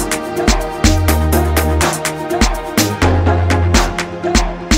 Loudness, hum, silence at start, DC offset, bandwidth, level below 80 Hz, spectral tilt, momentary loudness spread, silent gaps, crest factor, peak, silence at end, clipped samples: -15 LUFS; none; 0 s; under 0.1%; 16.5 kHz; -20 dBFS; -4.5 dB/octave; 5 LU; none; 14 dB; 0 dBFS; 0 s; under 0.1%